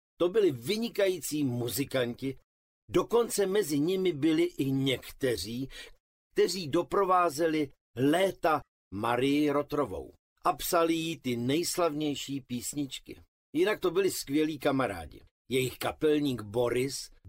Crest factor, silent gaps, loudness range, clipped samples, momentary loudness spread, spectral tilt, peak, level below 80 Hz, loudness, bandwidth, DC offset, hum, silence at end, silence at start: 16 dB; 2.44-2.88 s, 6.00-6.30 s, 7.81-7.94 s, 8.68-8.91 s, 10.19-10.36 s, 13.28-13.53 s, 15.31-15.45 s; 3 LU; under 0.1%; 9 LU; -5 dB/octave; -12 dBFS; -58 dBFS; -30 LUFS; 16 kHz; under 0.1%; none; 0 s; 0.2 s